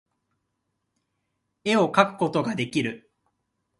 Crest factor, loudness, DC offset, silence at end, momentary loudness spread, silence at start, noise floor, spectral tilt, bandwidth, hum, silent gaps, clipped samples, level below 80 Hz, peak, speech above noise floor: 24 dB; -24 LUFS; under 0.1%; 0.8 s; 12 LU; 1.65 s; -78 dBFS; -5.5 dB/octave; 11.5 kHz; none; none; under 0.1%; -68 dBFS; -4 dBFS; 55 dB